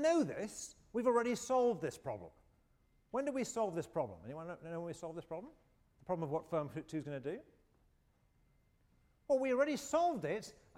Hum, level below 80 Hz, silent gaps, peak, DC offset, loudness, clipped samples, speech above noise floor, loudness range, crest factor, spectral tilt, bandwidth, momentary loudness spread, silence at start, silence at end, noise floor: none; -72 dBFS; none; -22 dBFS; under 0.1%; -38 LUFS; under 0.1%; 36 dB; 7 LU; 18 dB; -5.5 dB/octave; 16 kHz; 15 LU; 0 s; 0.25 s; -73 dBFS